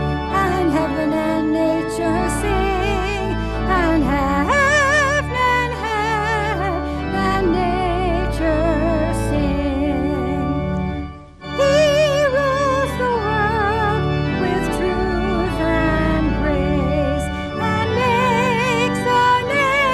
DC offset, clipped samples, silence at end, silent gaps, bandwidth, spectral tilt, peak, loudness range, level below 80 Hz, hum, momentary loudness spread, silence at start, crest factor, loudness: under 0.1%; under 0.1%; 0 s; none; 13.5 kHz; -6 dB/octave; -4 dBFS; 2 LU; -28 dBFS; none; 6 LU; 0 s; 14 dB; -18 LUFS